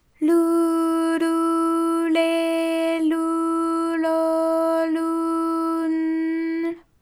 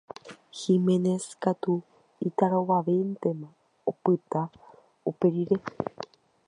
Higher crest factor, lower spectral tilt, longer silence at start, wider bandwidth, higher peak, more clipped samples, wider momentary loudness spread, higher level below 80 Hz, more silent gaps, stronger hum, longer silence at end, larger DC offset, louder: second, 12 dB vs 20 dB; second, -3.5 dB/octave vs -7.5 dB/octave; about the same, 0.2 s vs 0.25 s; first, 15 kHz vs 11 kHz; about the same, -8 dBFS vs -8 dBFS; neither; second, 3 LU vs 16 LU; about the same, -66 dBFS vs -70 dBFS; neither; neither; second, 0.2 s vs 0.45 s; neither; first, -22 LUFS vs -28 LUFS